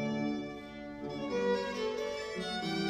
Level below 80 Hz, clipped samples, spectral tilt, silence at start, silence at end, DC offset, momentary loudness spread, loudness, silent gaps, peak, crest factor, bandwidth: -62 dBFS; under 0.1%; -5 dB/octave; 0 s; 0 s; under 0.1%; 11 LU; -36 LUFS; none; -20 dBFS; 16 dB; 14 kHz